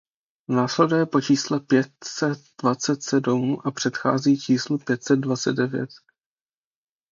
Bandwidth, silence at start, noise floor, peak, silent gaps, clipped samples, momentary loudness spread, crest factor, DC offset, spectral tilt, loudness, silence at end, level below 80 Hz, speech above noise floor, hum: 7.6 kHz; 0.5 s; under -90 dBFS; -4 dBFS; none; under 0.1%; 6 LU; 20 dB; under 0.1%; -5 dB/octave; -23 LUFS; 1.15 s; -68 dBFS; over 68 dB; none